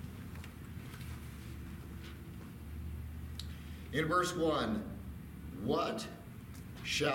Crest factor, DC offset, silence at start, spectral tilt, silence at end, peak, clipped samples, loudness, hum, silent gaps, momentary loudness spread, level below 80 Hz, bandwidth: 20 dB; under 0.1%; 0 s; -5 dB/octave; 0 s; -20 dBFS; under 0.1%; -39 LUFS; none; none; 15 LU; -52 dBFS; 17 kHz